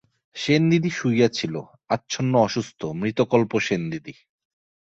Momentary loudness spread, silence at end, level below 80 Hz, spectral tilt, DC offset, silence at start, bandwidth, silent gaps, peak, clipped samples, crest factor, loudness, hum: 11 LU; 0.75 s; -60 dBFS; -6 dB/octave; under 0.1%; 0.35 s; 8 kHz; none; -4 dBFS; under 0.1%; 18 dB; -23 LUFS; none